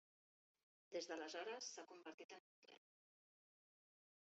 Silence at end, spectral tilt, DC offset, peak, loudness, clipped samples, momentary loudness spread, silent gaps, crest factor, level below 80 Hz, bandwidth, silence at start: 1.55 s; 0 dB/octave; under 0.1%; -36 dBFS; -53 LUFS; under 0.1%; 19 LU; 2.14-2.18 s, 2.24-2.29 s, 2.40-2.62 s; 20 dB; under -90 dBFS; 8 kHz; 0.9 s